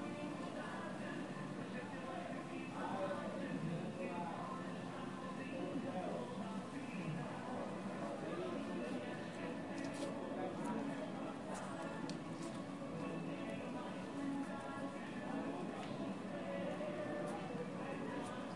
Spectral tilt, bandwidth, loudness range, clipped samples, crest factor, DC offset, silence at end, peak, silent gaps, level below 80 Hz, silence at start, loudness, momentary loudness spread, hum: -6 dB/octave; 11.5 kHz; 1 LU; under 0.1%; 14 dB; under 0.1%; 0 s; -30 dBFS; none; -76 dBFS; 0 s; -45 LUFS; 3 LU; none